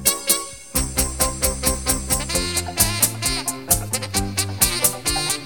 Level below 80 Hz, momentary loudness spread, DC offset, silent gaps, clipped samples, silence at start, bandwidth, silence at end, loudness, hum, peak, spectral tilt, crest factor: -32 dBFS; 6 LU; 0.5%; none; under 0.1%; 0 s; 17.5 kHz; 0 s; -20 LUFS; none; 0 dBFS; -2 dB/octave; 22 dB